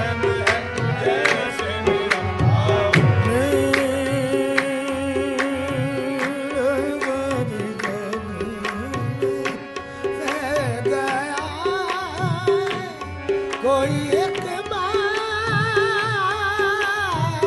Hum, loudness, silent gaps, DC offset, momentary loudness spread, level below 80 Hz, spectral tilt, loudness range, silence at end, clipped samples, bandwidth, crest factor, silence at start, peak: none; -22 LUFS; none; under 0.1%; 8 LU; -46 dBFS; -5.5 dB/octave; 6 LU; 0 s; under 0.1%; 12 kHz; 20 dB; 0 s; 0 dBFS